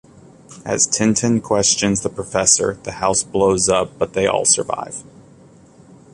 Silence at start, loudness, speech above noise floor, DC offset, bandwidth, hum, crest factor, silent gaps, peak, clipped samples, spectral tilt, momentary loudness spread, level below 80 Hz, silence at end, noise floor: 0.5 s; -17 LUFS; 28 dB; under 0.1%; 11.5 kHz; none; 20 dB; none; 0 dBFS; under 0.1%; -3 dB/octave; 11 LU; -48 dBFS; 1.1 s; -46 dBFS